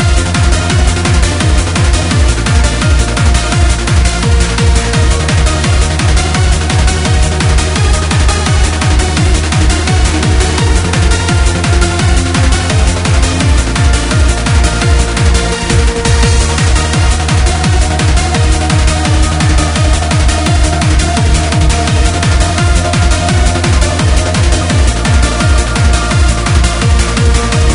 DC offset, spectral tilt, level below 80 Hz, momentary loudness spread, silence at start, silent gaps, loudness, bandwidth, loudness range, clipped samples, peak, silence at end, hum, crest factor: under 0.1%; -4.5 dB/octave; -12 dBFS; 1 LU; 0 s; none; -10 LUFS; 11 kHz; 0 LU; 0.1%; 0 dBFS; 0 s; none; 8 dB